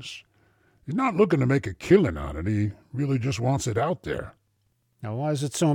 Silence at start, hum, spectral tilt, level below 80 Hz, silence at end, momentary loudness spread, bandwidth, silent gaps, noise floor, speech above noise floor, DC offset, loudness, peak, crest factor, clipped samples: 0 s; none; -6.5 dB/octave; -48 dBFS; 0 s; 16 LU; 17 kHz; none; -70 dBFS; 46 dB; under 0.1%; -25 LUFS; -6 dBFS; 20 dB; under 0.1%